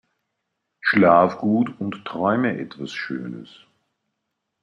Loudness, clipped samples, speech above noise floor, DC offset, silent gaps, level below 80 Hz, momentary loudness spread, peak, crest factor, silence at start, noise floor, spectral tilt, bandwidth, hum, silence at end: -21 LUFS; under 0.1%; 58 dB; under 0.1%; none; -66 dBFS; 16 LU; -2 dBFS; 20 dB; 0.85 s; -79 dBFS; -7.5 dB/octave; 9.8 kHz; none; 1.15 s